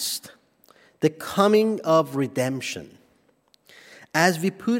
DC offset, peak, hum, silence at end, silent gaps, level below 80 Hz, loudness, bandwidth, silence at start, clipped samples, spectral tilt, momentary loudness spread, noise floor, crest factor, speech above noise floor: under 0.1%; -4 dBFS; none; 0 s; none; -70 dBFS; -23 LUFS; 16.5 kHz; 0 s; under 0.1%; -4.5 dB/octave; 12 LU; -63 dBFS; 22 dB; 41 dB